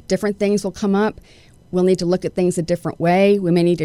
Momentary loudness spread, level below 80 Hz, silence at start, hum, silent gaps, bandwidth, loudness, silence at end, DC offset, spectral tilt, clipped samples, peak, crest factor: 7 LU; -48 dBFS; 0.1 s; none; none; 13 kHz; -18 LUFS; 0 s; under 0.1%; -6.5 dB/octave; under 0.1%; -4 dBFS; 14 dB